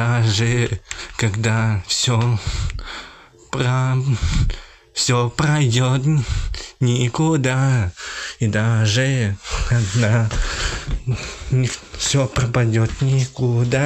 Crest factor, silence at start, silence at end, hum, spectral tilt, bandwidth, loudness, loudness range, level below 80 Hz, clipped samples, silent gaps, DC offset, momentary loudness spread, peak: 14 dB; 0 s; 0 s; none; -5 dB/octave; 9 kHz; -20 LUFS; 2 LU; -30 dBFS; under 0.1%; none; under 0.1%; 9 LU; -4 dBFS